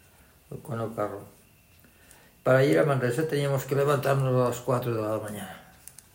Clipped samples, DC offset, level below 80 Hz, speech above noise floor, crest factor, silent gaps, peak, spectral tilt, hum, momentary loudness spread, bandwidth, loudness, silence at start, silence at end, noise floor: under 0.1%; under 0.1%; -62 dBFS; 32 dB; 18 dB; none; -10 dBFS; -6.5 dB/octave; none; 21 LU; 16.5 kHz; -26 LUFS; 0.5 s; 0.55 s; -57 dBFS